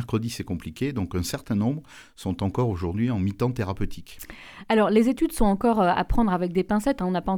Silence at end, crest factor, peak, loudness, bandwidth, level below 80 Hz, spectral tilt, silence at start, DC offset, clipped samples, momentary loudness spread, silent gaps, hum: 0 s; 16 dB; -8 dBFS; -25 LUFS; 19.5 kHz; -38 dBFS; -6.5 dB/octave; 0 s; under 0.1%; under 0.1%; 14 LU; none; none